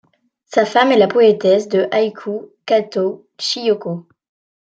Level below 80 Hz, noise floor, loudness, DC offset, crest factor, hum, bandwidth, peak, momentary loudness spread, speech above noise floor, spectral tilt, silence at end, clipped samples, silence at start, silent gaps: -68 dBFS; -51 dBFS; -16 LUFS; under 0.1%; 16 dB; none; 8.8 kHz; -2 dBFS; 14 LU; 35 dB; -5 dB/octave; 0.65 s; under 0.1%; 0.5 s; none